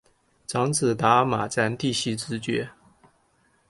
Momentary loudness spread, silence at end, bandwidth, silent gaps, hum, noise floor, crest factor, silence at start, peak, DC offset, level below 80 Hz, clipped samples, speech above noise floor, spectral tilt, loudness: 10 LU; 1 s; 11.5 kHz; none; none; -65 dBFS; 20 dB; 0.5 s; -6 dBFS; under 0.1%; -60 dBFS; under 0.1%; 41 dB; -4.5 dB/octave; -24 LUFS